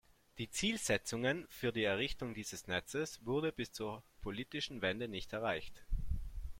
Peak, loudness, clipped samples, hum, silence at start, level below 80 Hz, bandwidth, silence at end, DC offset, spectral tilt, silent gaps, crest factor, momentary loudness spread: -20 dBFS; -39 LUFS; under 0.1%; none; 0.35 s; -50 dBFS; 16.5 kHz; 0 s; under 0.1%; -4 dB/octave; none; 20 dB; 10 LU